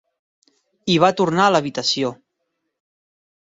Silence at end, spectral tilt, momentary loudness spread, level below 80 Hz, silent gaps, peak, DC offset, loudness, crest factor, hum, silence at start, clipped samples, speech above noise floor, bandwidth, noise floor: 1.25 s; -4.5 dB/octave; 9 LU; -62 dBFS; none; -2 dBFS; under 0.1%; -18 LUFS; 20 dB; none; 0.85 s; under 0.1%; 58 dB; 7.8 kHz; -76 dBFS